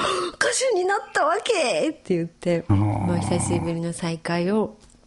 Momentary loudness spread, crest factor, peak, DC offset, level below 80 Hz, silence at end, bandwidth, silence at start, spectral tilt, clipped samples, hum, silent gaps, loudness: 6 LU; 20 dB; -2 dBFS; under 0.1%; -50 dBFS; 0.3 s; 11.5 kHz; 0 s; -5 dB/octave; under 0.1%; none; none; -23 LUFS